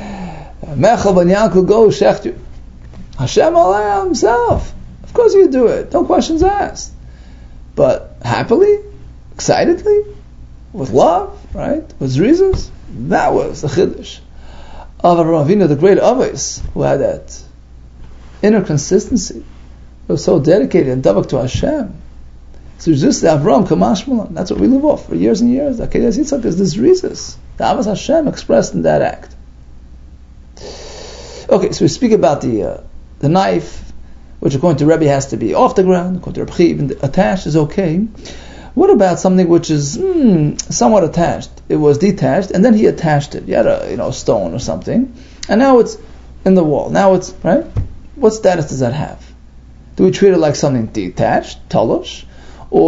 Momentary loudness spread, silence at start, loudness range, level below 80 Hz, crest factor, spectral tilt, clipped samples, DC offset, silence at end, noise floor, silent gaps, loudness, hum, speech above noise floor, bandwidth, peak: 15 LU; 0 s; 4 LU; -34 dBFS; 14 dB; -6 dB/octave; under 0.1%; under 0.1%; 0 s; -37 dBFS; none; -13 LUFS; none; 25 dB; 7.8 kHz; 0 dBFS